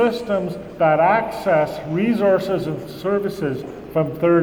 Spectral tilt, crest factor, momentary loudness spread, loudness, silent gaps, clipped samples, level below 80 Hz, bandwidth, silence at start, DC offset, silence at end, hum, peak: -7.5 dB/octave; 14 dB; 9 LU; -20 LUFS; none; under 0.1%; -50 dBFS; 19.5 kHz; 0 s; under 0.1%; 0 s; none; -4 dBFS